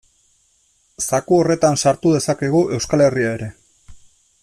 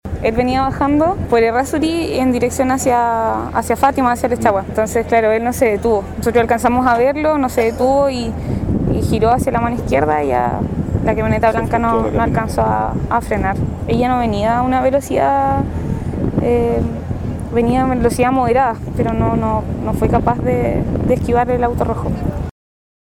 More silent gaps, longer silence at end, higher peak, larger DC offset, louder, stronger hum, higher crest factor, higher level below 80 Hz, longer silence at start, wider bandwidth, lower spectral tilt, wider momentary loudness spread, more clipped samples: neither; second, 0.45 s vs 0.6 s; second, -4 dBFS vs 0 dBFS; neither; about the same, -17 LUFS vs -16 LUFS; neither; about the same, 16 dB vs 16 dB; second, -50 dBFS vs -30 dBFS; first, 1 s vs 0.05 s; second, 14 kHz vs 18 kHz; second, -5 dB/octave vs -6.5 dB/octave; about the same, 8 LU vs 6 LU; neither